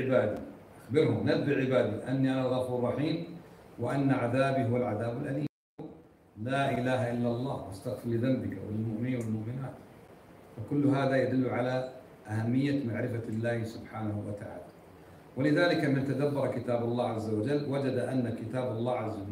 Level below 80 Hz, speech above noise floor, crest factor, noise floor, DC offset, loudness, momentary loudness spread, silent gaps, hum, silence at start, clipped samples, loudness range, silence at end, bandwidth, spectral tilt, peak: -64 dBFS; 23 dB; 18 dB; -53 dBFS; under 0.1%; -31 LUFS; 15 LU; 5.49-5.78 s; none; 0 s; under 0.1%; 4 LU; 0 s; 15.5 kHz; -8 dB/octave; -12 dBFS